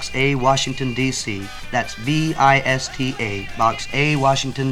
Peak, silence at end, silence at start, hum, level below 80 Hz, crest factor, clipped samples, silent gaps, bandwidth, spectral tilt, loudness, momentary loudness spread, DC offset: -2 dBFS; 0 s; 0 s; none; -40 dBFS; 18 dB; under 0.1%; none; 15 kHz; -4.5 dB/octave; -19 LUFS; 9 LU; under 0.1%